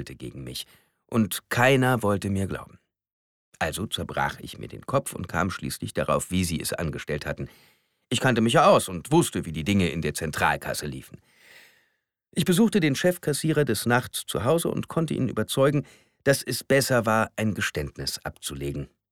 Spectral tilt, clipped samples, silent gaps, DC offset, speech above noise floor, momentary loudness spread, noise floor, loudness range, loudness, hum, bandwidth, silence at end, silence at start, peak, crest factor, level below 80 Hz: -5 dB/octave; under 0.1%; 3.12-3.52 s; under 0.1%; 49 dB; 14 LU; -74 dBFS; 5 LU; -25 LUFS; none; 19 kHz; 0.25 s; 0 s; -6 dBFS; 20 dB; -50 dBFS